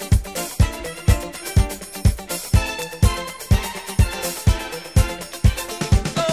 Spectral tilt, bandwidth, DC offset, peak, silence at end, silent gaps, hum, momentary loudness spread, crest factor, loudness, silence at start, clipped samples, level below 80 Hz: -5 dB/octave; 16 kHz; 0.2%; -2 dBFS; 0 s; none; none; 5 LU; 16 dB; -22 LUFS; 0 s; under 0.1%; -24 dBFS